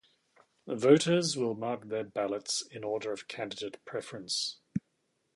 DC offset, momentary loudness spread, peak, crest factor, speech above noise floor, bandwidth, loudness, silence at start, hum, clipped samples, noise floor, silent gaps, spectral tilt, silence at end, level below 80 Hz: under 0.1%; 15 LU; -8 dBFS; 24 dB; 46 dB; 11.5 kHz; -32 LUFS; 0.65 s; none; under 0.1%; -77 dBFS; none; -4 dB/octave; 0.55 s; -72 dBFS